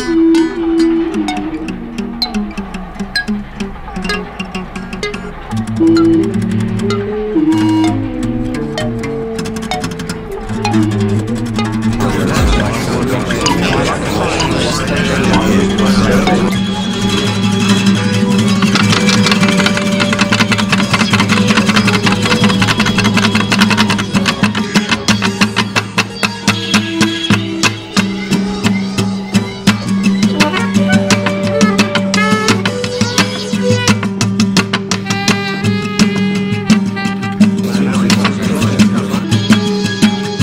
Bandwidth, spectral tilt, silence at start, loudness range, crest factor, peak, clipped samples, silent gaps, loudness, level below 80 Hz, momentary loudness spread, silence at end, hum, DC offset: 16 kHz; -5 dB/octave; 0 s; 6 LU; 12 dB; 0 dBFS; under 0.1%; none; -13 LUFS; -32 dBFS; 9 LU; 0 s; none; under 0.1%